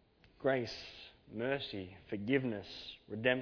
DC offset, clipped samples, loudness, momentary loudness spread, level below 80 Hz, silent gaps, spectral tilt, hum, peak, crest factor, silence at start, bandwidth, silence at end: under 0.1%; under 0.1%; -38 LUFS; 13 LU; -68 dBFS; none; -4 dB/octave; none; -16 dBFS; 22 dB; 0.4 s; 5.4 kHz; 0 s